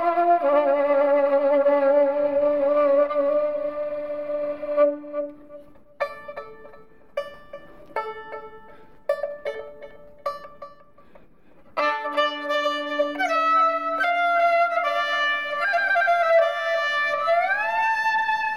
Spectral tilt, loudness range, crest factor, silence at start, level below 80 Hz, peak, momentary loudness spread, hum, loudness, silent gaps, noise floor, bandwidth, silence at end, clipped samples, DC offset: -3 dB/octave; 14 LU; 14 dB; 0 s; -64 dBFS; -10 dBFS; 15 LU; none; -22 LUFS; none; -55 dBFS; 10.5 kHz; 0 s; under 0.1%; 0.3%